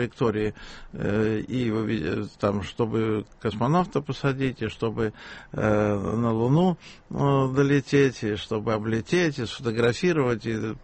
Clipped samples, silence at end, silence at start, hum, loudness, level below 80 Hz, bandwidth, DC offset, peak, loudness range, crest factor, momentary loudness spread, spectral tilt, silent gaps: under 0.1%; 0 s; 0 s; none; -25 LUFS; -50 dBFS; 8.4 kHz; under 0.1%; -8 dBFS; 3 LU; 16 dB; 8 LU; -7 dB/octave; none